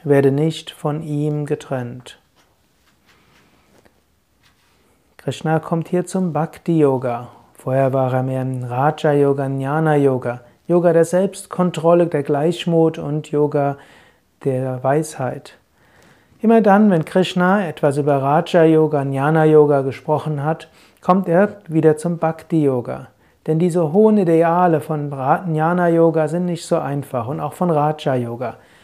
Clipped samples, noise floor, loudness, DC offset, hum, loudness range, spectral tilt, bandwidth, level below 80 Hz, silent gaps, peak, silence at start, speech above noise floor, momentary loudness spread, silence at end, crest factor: under 0.1%; -61 dBFS; -18 LUFS; under 0.1%; none; 9 LU; -7.5 dB/octave; 14 kHz; -62 dBFS; none; 0 dBFS; 0.05 s; 44 dB; 12 LU; 0.3 s; 18 dB